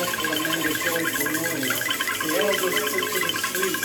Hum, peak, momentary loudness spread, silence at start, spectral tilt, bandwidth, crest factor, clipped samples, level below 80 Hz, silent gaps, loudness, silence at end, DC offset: none; -8 dBFS; 2 LU; 0 s; -2 dB/octave; over 20 kHz; 16 dB; under 0.1%; -60 dBFS; none; -23 LUFS; 0 s; under 0.1%